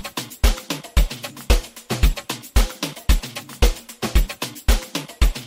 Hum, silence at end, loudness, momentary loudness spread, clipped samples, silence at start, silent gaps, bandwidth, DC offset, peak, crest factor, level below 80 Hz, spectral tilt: none; 0 s; -23 LUFS; 7 LU; under 0.1%; 0 s; none; 16.5 kHz; 0.2%; -2 dBFS; 18 dB; -22 dBFS; -4 dB/octave